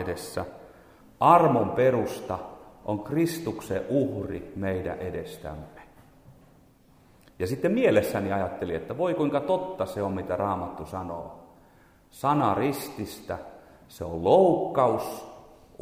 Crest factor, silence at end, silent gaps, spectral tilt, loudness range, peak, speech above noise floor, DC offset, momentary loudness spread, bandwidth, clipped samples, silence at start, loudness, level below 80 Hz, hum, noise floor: 22 dB; 0.35 s; none; -6.5 dB/octave; 7 LU; -6 dBFS; 32 dB; under 0.1%; 18 LU; 16.5 kHz; under 0.1%; 0 s; -26 LUFS; -56 dBFS; none; -58 dBFS